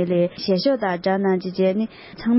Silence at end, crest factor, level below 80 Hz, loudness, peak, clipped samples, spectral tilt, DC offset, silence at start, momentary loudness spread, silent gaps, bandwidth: 0 s; 14 dB; -58 dBFS; -22 LUFS; -8 dBFS; under 0.1%; -10.5 dB/octave; under 0.1%; 0 s; 6 LU; none; 5.8 kHz